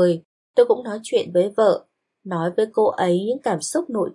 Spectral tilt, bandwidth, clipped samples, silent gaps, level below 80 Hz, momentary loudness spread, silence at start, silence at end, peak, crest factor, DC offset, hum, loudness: -5.5 dB/octave; 11.5 kHz; under 0.1%; 0.25-0.54 s; -76 dBFS; 7 LU; 0 s; 0 s; -4 dBFS; 16 dB; under 0.1%; none; -21 LUFS